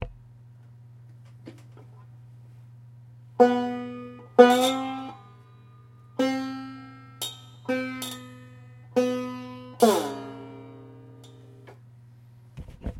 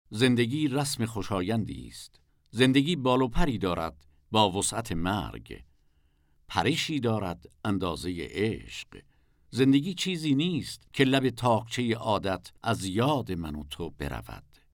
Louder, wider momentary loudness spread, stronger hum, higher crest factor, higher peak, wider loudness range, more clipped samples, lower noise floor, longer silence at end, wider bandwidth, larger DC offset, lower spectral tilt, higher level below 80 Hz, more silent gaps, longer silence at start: first, -25 LUFS vs -28 LUFS; first, 26 LU vs 15 LU; neither; about the same, 26 dB vs 22 dB; first, -2 dBFS vs -8 dBFS; first, 9 LU vs 4 LU; neither; second, -51 dBFS vs -66 dBFS; second, 0 s vs 0.35 s; second, 16.5 kHz vs 18.5 kHz; neither; about the same, -4.5 dB/octave vs -5 dB/octave; second, -54 dBFS vs -44 dBFS; neither; about the same, 0 s vs 0.1 s